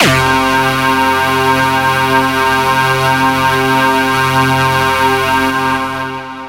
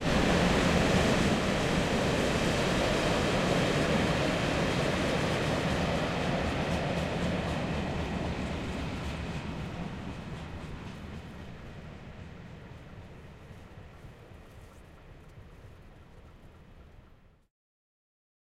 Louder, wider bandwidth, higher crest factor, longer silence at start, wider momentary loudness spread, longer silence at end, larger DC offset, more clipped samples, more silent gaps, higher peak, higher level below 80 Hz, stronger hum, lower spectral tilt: first, -11 LUFS vs -29 LUFS; about the same, 16 kHz vs 15.5 kHz; second, 12 dB vs 18 dB; about the same, 0 s vs 0 s; second, 2 LU vs 23 LU; second, 0 s vs 1.4 s; neither; neither; neither; first, 0 dBFS vs -12 dBFS; about the same, -38 dBFS vs -42 dBFS; neither; about the same, -4 dB/octave vs -5 dB/octave